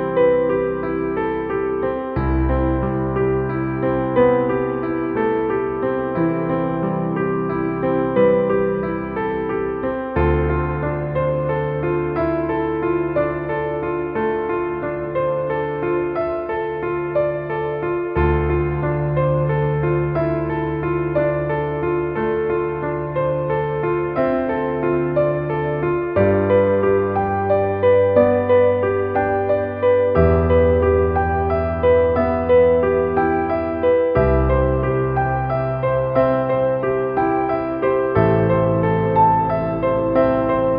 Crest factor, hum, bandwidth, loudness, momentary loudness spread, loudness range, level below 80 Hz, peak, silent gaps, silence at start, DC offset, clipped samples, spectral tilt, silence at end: 16 dB; none; 5 kHz; -19 LUFS; 7 LU; 5 LU; -32 dBFS; -2 dBFS; none; 0 s; under 0.1%; under 0.1%; -11.5 dB/octave; 0 s